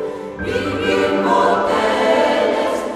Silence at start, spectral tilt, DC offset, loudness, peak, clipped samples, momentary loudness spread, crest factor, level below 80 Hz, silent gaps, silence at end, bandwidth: 0 s; -5 dB/octave; under 0.1%; -17 LUFS; -2 dBFS; under 0.1%; 7 LU; 14 dB; -46 dBFS; none; 0 s; 14 kHz